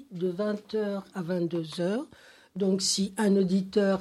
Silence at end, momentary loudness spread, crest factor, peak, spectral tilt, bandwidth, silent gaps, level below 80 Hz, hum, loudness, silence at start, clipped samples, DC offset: 0 s; 9 LU; 16 dB; -12 dBFS; -5 dB/octave; 13.5 kHz; none; -68 dBFS; none; -28 LUFS; 0 s; under 0.1%; under 0.1%